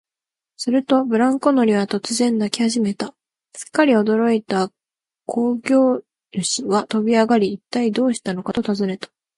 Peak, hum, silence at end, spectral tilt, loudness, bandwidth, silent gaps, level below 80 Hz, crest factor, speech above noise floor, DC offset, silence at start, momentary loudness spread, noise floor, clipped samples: 0 dBFS; none; 0.3 s; -4.5 dB/octave; -19 LUFS; 11.5 kHz; none; -62 dBFS; 18 dB; 71 dB; under 0.1%; 0.6 s; 11 LU; -89 dBFS; under 0.1%